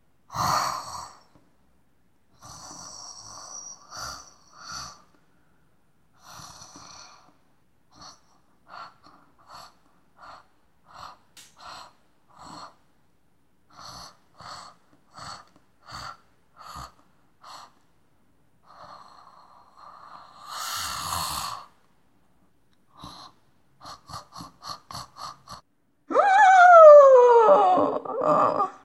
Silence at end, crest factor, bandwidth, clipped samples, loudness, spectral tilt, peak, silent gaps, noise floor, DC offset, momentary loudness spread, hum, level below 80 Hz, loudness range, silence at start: 0.15 s; 22 dB; 15.5 kHz; under 0.1%; -17 LUFS; -3 dB/octave; -2 dBFS; none; -68 dBFS; under 0.1%; 30 LU; none; -62 dBFS; 30 LU; 0.35 s